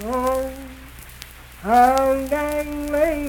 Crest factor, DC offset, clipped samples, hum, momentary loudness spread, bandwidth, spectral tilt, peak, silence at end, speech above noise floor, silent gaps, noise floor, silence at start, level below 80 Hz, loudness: 16 dB; under 0.1%; under 0.1%; none; 23 LU; 19 kHz; -5 dB/octave; -4 dBFS; 0 s; 22 dB; none; -40 dBFS; 0 s; -38 dBFS; -20 LUFS